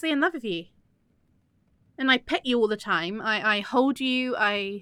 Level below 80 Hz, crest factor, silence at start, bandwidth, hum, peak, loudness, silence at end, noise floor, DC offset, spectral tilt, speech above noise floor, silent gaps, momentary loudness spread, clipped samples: -64 dBFS; 18 dB; 0 s; 13 kHz; none; -8 dBFS; -25 LUFS; 0 s; -66 dBFS; under 0.1%; -4.5 dB/octave; 41 dB; none; 5 LU; under 0.1%